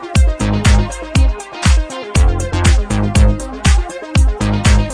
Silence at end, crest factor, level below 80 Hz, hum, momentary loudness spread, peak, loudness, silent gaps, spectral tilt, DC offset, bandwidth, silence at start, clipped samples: 0 s; 12 dB; -14 dBFS; none; 5 LU; 0 dBFS; -15 LUFS; none; -5 dB/octave; under 0.1%; 11 kHz; 0 s; under 0.1%